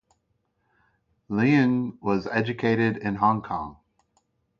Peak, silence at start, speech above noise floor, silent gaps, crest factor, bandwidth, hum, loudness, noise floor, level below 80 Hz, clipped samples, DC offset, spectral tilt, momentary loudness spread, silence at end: -6 dBFS; 1.3 s; 49 dB; none; 20 dB; 7 kHz; none; -24 LUFS; -73 dBFS; -58 dBFS; under 0.1%; under 0.1%; -8 dB/octave; 11 LU; 0.85 s